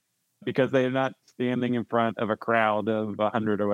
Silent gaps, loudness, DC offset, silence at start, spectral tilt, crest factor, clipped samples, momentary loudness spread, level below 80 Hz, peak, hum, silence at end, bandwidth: none; -26 LUFS; under 0.1%; 0.45 s; -7.5 dB/octave; 18 dB; under 0.1%; 7 LU; -78 dBFS; -8 dBFS; none; 0 s; 7.4 kHz